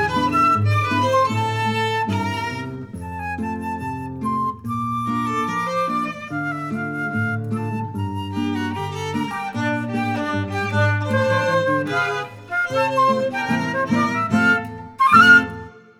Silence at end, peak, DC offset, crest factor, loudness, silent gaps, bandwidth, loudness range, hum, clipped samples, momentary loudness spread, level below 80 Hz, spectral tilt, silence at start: 0.2 s; -2 dBFS; under 0.1%; 20 dB; -20 LUFS; none; 15.5 kHz; 7 LU; none; under 0.1%; 10 LU; -52 dBFS; -6 dB/octave; 0 s